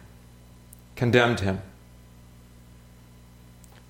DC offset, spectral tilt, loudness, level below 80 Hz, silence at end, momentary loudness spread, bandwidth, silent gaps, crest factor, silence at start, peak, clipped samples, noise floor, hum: under 0.1%; -6 dB/octave; -24 LUFS; -52 dBFS; 2.2 s; 25 LU; 16.5 kHz; none; 26 dB; 0.95 s; -4 dBFS; under 0.1%; -50 dBFS; 60 Hz at -45 dBFS